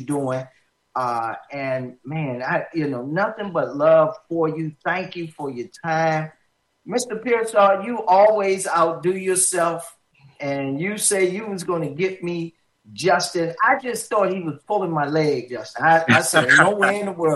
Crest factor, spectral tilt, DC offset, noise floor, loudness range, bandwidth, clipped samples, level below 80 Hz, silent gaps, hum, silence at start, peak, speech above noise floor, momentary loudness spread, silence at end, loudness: 20 dB; -4 dB/octave; under 0.1%; -57 dBFS; 6 LU; 12.5 kHz; under 0.1%; -68 dBFS; none; none; 0 s; -2 dBFS; 36 dB; 14 LU; 0 s; -20 LUFS